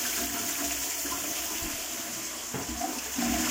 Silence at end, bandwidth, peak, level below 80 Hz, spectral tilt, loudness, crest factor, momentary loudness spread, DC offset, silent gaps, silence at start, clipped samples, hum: 0 s; 16.5 kHz; -16 dBFS; -50 dBFS; -1.5 dB/octave; -30 LUFS; 16 dB; 5 LU; under 0.1%; none; 0 s; under 0.1%; none